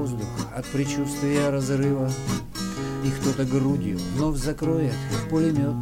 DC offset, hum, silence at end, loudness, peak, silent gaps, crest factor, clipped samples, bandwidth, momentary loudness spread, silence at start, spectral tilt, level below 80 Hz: under 0.1%; none; 0 s; -25 LUFS; -10 dBFS; none; 14 dB; under 0.1%; 16.5 kHz; 6 LU; 0 s; -6 dB/octave; -40 dBFS